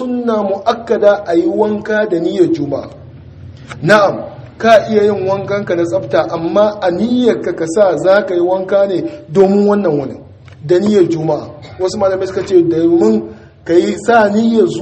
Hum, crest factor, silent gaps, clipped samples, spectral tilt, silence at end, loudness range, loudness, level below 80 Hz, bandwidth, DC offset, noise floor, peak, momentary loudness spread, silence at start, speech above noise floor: none; 12 dB; none; 0.2%; -6.5 dB/octave; 0 s; 2 LU; -13 LUFS; -50 dBFS; 8.8 kHz; under 0.1%; -33 dBFS; 0 dBFS; 10 LU; 0 s; 21 dB